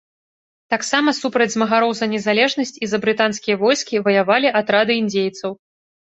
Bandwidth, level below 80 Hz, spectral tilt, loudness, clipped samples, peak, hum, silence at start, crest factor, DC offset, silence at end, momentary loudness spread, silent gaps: 8.2 kHz; -64 dBFS; -3.5 dB/octave; -18 LUFS; under 0.1%; 0 dBFS; none; 0.7 s; 18 dB; under 0.1%; 0.6 s; 7 LU; none